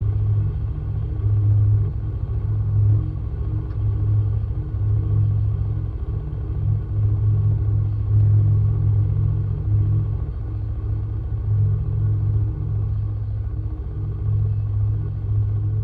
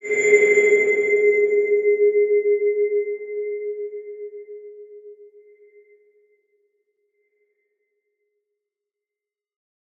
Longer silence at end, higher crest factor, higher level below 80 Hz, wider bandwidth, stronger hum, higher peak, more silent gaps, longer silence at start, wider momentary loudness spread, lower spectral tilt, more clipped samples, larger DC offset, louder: second, 0 s vs 4.75 s; second, 10 dB vs 20 dB; first, -28 dBFS vs -82 dBFS; second, 1.6 kHz vs 7.6 kHz; neither; second, -10 dBFS vs -4 dBFS; neither; about the same, 0 s vs 0.05 s; second, 8 LU vs 21 LU; first, -12.5 dB/octave vs -3.5 dB/octave; neither; neither; second, -22 LUFS vs -18 LUFS